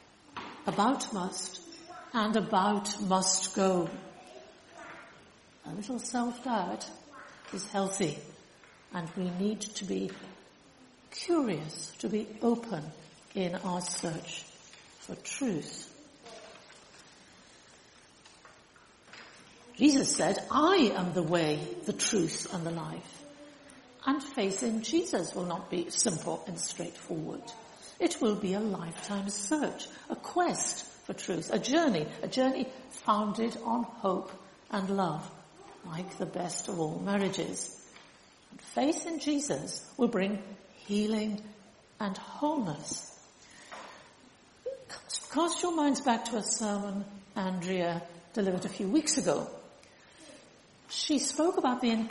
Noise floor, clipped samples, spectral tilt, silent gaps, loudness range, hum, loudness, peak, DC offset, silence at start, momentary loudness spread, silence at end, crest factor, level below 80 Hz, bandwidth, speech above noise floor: -59 dBFS; under 0.1%; -4 dB/octave; none; 8 LU; none; -32 LUFS; -12 dBFS; under 0.1%; 0.35 s; 21 LU; 0 s; 20 dB; -70 dBFS; 11.5 kHz; 28 dB